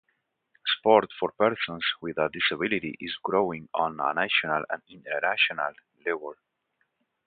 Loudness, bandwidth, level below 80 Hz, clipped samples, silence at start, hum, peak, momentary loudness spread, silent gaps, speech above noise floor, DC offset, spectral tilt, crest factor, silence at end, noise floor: -27 LUFS; 4.8 kHz; -68 dBFS; under 0.1%; 0.65 s; none; -4 dBFS; 12 LU; none; 49 dB; under 0.1%; -8 dB/octave; 24 dB; 0.95 s; -76 dBFS